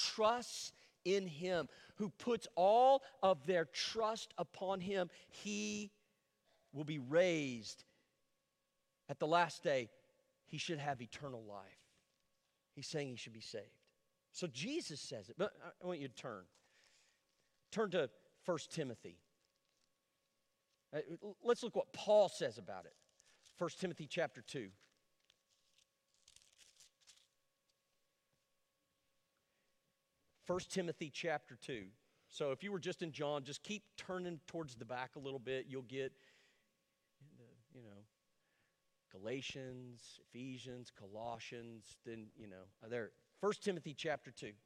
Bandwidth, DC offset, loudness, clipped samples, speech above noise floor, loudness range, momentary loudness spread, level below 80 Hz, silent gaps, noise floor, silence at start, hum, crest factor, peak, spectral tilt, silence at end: 13.5 kHz; under 0.1%; -41 LUFS; under 0.1%; 44 dB; 15 LU; 18 LU; -82 dBFS; none; -85 dBFS; 0 s; none; 24 dB; -20 dBFS; -4.5 dB/octave; 0.1 s